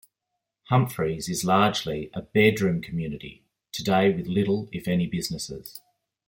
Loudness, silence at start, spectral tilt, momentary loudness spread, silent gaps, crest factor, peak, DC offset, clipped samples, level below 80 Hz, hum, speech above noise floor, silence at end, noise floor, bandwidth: -25 LUFS; 0.7 s; -5.5 dB/octave; 15 LU; none; 20 dB; -6 dBFS; under 0.1%; under 0.1%; -56 dBFS; none; 59 dB; 0.5 s; -83 dBFS; 17 kHz